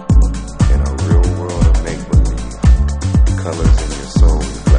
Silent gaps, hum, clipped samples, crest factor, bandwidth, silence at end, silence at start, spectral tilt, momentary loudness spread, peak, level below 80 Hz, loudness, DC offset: none; none; under 0.1%; 12 dB; 10 kHz; 0 s; 0 s; -6.5 dB/octave; 4 LU; 0 dBFS; -14 dBFS; -15 LUFS; under 0.1%